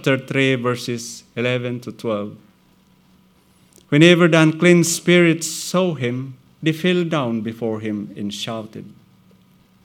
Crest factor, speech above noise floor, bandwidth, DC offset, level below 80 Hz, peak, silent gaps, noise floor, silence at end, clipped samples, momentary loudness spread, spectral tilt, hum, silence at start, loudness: 20 dB; 37 dB; 16.5 kHz; under 0.1%; -68 dBFS; 0 dBFS; none; -55 dBFS; 0.95 s; under 0.1%; 15 LU; -5 dB/octave; none; 0 s; -18 LUFS